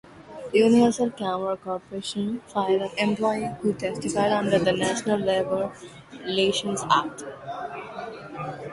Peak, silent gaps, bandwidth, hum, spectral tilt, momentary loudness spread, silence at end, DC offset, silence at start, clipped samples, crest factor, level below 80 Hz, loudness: -6 dBFS; none; 11.5 kHz; none; -4.5 dB/octave; 15 LU; 0 s; under 0.1%; 0.1 s; under 0.1%; 20 dB; -60 dBFS; -25 LUFS